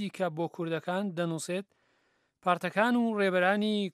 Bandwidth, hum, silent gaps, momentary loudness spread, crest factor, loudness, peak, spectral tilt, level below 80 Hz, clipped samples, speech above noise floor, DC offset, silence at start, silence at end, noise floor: 14 kHz; none; none; 8 LU; 20 dB; -30 LUFS; -12 dBFS; -5.5 dB/octave; -84 dBFS; under 0.1%; 43 dB; under 0.1%; 0 s; 0.05 s; -73 dBFS